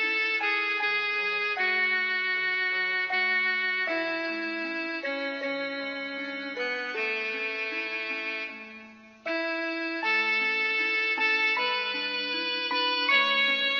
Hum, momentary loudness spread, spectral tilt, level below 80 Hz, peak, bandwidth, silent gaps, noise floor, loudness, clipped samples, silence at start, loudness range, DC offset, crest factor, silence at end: none; 9 LU; -2 dB/octave; -80 dBFS; -12 dBFS; 7 kHz; none; -49 dBFS; -26 LUFS; under 0.1%; 0 s; 6 LU; under 0.1%; 16 dB; 0 s